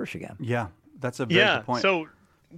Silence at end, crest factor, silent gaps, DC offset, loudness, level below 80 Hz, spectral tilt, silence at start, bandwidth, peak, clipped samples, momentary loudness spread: 0 s; 20 dB; none; under 0.1%; -24 LUFS; -64 dBFS; -5 dB/octave; 0 s; 14.5 kHz; -6 dBFS; under 0.1%; 15 LU